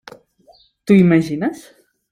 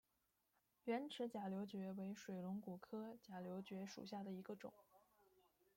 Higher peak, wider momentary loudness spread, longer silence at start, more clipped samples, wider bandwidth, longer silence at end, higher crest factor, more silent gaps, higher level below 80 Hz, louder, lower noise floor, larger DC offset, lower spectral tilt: first, -2 dBFS vs -32 dBFS; first, 21 LU vs 8 LU; about the same, 0.85 s vs 0.85 s; neither; second, 12 kHz vs 16.5 kHz; first, 0.55 s vs 0.35 s; about the same, 16 dB vs 20 dB; neither; first, -56 dBFS vs -90 dBFS; first, -15 LUFS vs -51 LUFS; second, -52 dBFS vs -87 dBFS; neither; first, -8 dB/octave vs -6.5 dB/octave